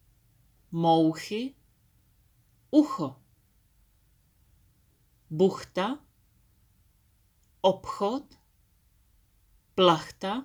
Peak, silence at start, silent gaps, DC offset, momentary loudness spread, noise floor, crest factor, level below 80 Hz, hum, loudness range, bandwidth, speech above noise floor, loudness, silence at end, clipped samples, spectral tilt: -6 dBFS; 0.7 s; none; under 0.1%; 14 LU; -66 dBFS; 24 dB; -66 dBFS; none; 5 LU; 20 kHz; 40 dB; -27 LUFS; 0 s; under 0.1%; -6 dB/octave